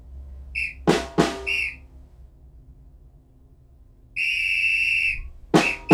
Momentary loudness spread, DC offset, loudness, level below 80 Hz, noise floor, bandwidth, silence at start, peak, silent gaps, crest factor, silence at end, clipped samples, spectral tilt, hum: 14 LU; under 0.1%; -22 LUFS; -42 dBFS; -52 dBFS; 17 kHz; 0 s; 0 dBFS; none; 24 dB; 0 s; under 0.1%; -4.5 dB/octave; none